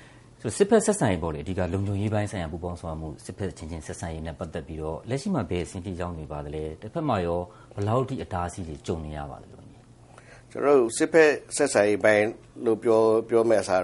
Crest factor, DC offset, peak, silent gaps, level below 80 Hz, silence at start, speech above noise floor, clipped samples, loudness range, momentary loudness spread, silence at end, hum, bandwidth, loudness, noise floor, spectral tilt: 20 dB; under 0.1%; -4 dBFS; none; -48 dBFS; 0 s; 25 dB; under 0.1%; 10 LU; 15 LU; 0 s; none; 11.5 kHz; -26 LUFS; -51 dBFS; -5.5 dB/octave